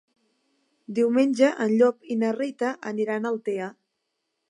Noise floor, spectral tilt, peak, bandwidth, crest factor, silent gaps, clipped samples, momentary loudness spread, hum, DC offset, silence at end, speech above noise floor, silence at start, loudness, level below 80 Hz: -79 dBFS; -6 dB/octave; -8 dBFS; 11 kHz; 18 dB; none; under 0.1%; 10 LU; none; under 0.1%; 0.8 s; 55 dB; 0.9 s; -24 LUFS; -80 dBFS